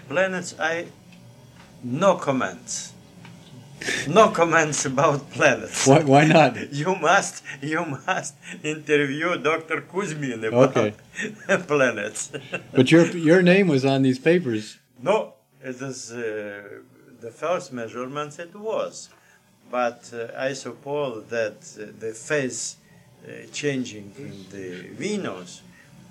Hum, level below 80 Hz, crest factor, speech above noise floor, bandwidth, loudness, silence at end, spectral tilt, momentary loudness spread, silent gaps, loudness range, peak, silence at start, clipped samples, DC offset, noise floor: none; -66 dBFS; 22 dB; 34 dB; 14 kHz; -22 LUFS; 0.1 s; -5 dB/octave; 19 LU; none; 12 LU; -2 dBFS; 0.05 s; under 0.1%; under 0.1%; -56 dBFS